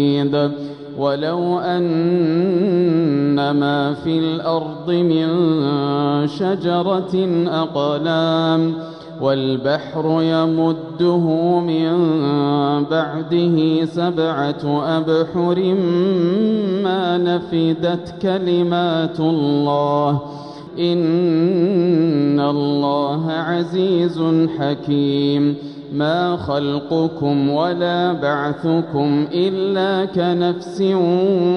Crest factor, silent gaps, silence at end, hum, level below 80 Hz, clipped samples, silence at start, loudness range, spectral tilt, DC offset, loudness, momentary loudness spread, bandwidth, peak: 12 dB; none; 0 s; none; -58 dBFS; under 0.1%; 0 s; 1 LU; -8.5 dB/octave; under 0.1%; -18 LUFS; 4 LU; 6.4 kHz; -4 dBFS